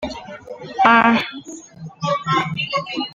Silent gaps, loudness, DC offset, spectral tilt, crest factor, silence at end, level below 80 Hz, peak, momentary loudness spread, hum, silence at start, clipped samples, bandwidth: none; -18 LUFS; under 0.1%; -5 dB/octave; 18 dB; 0 s; -54 dBFS; -2 dBFS; 22 LU; none; 0 s; under 0.1%; 7.6 kHz